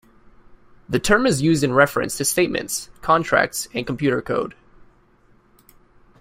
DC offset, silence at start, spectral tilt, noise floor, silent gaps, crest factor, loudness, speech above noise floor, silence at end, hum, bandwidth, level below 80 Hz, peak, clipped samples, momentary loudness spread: under 0.1%; 0.5 s; -4 dB/octave; -56 dBFS; none; 20 dB; -20 LUFS; 36 dB; 1.7 s; none; 16 kHz; -46 dBFS; -2 dBFS; under 0.1%; 9 LU